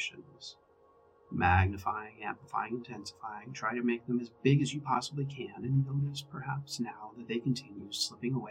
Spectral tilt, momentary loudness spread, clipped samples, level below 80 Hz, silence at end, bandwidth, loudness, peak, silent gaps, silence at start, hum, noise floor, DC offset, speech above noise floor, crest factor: -5.5 dB/octave; 14 LU; under 0.1%; -60 dBFS; 0 s; 13.5 kHz; -34 LUFS; -12 dBFS; none; 0 s; none; -64 dBFS; under 0.1%; 30 dB; 22 dB